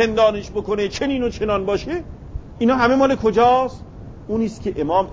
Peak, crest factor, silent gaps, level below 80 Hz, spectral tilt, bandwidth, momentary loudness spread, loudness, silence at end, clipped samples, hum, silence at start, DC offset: -4 dBFS; 16 dB; none; -38 dBFS; -6 dB/octave; 7.8 kHz; 20 LU; -19 LUFS; 0 s; under 0.1%; none; 0 s; under 0.1%